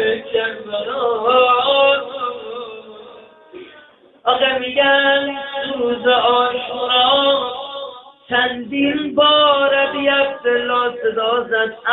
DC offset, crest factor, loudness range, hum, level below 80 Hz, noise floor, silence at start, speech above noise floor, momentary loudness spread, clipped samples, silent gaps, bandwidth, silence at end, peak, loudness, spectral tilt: under 0.1%; 16 dB; 3 LU; none; -58 dBFS; -47 dBFS; 0 s; 31 dB; 12 LU; under 0.1%; none; 4.2 kHz; 0 s; -2 dBFS; -16 LUFS; -7.5 dB/octave